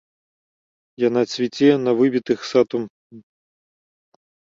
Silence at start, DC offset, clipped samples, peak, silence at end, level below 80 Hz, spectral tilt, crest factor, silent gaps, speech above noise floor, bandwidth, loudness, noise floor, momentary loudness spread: 1 s; under 0.1%; under 0.1%; -4 dBFS; 1.4 s; -68 dBFS; -6 dB/octave; 18 dB; 2.90-3.10 s; over 72 dB; 7.6 kHz; -19 LUFS; under -90 dBFS; 6 LU